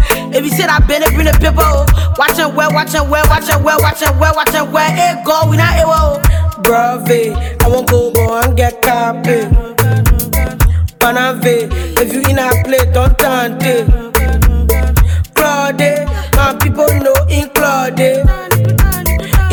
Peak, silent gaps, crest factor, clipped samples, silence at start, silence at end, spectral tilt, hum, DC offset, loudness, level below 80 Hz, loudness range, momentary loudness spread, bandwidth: 0 dBFS; none; 10 dB; under 0.1%; 0 s; 0 s; -5 dB/octave; none; under 0.1%; -11 LUFS; -16 dBFS; 1 LU; 3 LU; 19.5 kHz